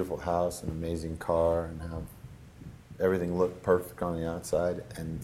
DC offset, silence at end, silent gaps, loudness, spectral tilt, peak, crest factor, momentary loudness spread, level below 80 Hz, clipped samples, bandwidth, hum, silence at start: under 0.1%; 0 s; none; -31 LUFS; -6.5 dB/octave; -12 dBFS; 20 dB; 21 LU; -48 dBFS; under 0.1%; 16 kHz; none; 0 s